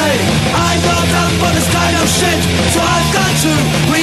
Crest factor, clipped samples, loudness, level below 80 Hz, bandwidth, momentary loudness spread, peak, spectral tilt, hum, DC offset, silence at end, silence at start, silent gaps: 10 dB; under 0.1%; -12 LUFS; -28 dBFS; 13.5 kHz; 1 LU; -2 dBFS; -4 dB/octave; none; under 0.1%; 0 s; 0 s; none